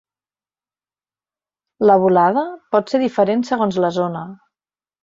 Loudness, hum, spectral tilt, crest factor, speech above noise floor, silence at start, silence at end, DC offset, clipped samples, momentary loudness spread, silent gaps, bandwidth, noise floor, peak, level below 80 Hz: -17 LUFS; none; -7 dB/octave; 18 dB; over 74 dB; 1.8 s; 0.7 s; under 0.1%; under 0.1%; 10 LU; none; 7.6 kHz; under -90 dBFS; -2 dBFS; -64 dBFS